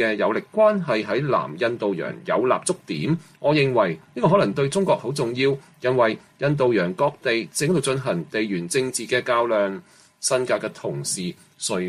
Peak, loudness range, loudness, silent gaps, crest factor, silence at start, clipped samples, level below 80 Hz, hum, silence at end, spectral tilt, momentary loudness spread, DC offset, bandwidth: -6 dBFS; 2 LU; -22 LUFS; none; 16 dB; 0 s; under 0.1%; -62 dBFS; none; 0 s; -5 dB/octave; 7 LU; under 0.1%; 15 kHz